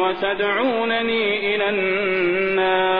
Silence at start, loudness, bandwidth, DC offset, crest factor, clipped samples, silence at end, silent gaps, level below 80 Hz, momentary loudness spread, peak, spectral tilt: 0 s; -20 LUFS; 5.2 kHz; 0.6%; 14 dB; under 0.1%; 0 s; none; -56 dBFS; 2 LU; -6 dBFS; -7.5 dB/octave